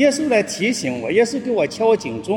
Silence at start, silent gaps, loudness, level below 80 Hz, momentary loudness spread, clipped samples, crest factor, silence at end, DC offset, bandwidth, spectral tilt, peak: 0 s; none; -19 LUFS; -58 dBFS; 4 LU; under 0.1%; 16 dB; 0 s; under 0.1%; 17 kHz; -4 dB/octave; -2 dBFS